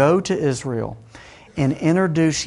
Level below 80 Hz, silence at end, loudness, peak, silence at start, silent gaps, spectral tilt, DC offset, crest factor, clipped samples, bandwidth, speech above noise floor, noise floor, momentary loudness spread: -50 dBFS; 0 s; -20 LUFS; -2 dBFS; 0 s; none; -6 dB/octave; under 0.1%; 18 dB; under 0.1%; 11.5 kHz; 25 dB; -44 dBFS; 14 LU